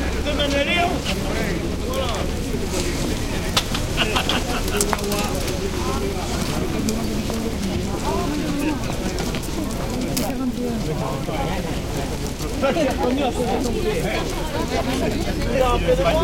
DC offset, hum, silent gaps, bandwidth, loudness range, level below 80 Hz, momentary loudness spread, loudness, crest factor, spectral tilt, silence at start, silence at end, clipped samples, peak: under 0.1%; none; none; 17 kHz; 2 LU; -30 dBFS; 6 LU; -23 LUFS; 22 dB; -4.5 dB/octave; 0 s; 0 s; under 0.1%; 0 dBFS